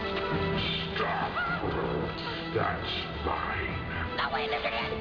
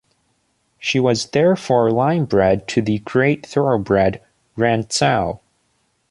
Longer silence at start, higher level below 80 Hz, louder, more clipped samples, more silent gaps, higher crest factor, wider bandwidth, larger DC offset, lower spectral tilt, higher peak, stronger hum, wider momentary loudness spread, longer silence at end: second, 0 s vs 0.8 s; about the same, -46 dBFS vs -46 dBFS; second, -31 LUFS vs -18 LUFS; neither; neither; about the same, 14 dB vs 16 dB; second, 5.4 kHz vs 11.5 kHz; neither; first, -7 dB/octave vs -5.5 dB/octave; second, -16 dBFS vs -2 dBFS; neither; second, 3 LU vs 6 LU; second, 0 s vs 0.75 s